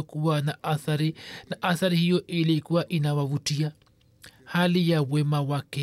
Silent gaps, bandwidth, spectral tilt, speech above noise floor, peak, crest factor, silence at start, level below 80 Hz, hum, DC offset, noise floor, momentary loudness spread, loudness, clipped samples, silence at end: none; 14 kHz; -6 dB/octave; 28 dB; -12 dBFS; 14 dB; 0 s; -68 dBFS; none; under 0.1%; -54 dBFS; 7 LU; -26 LUFS; under 0.1%; 0 s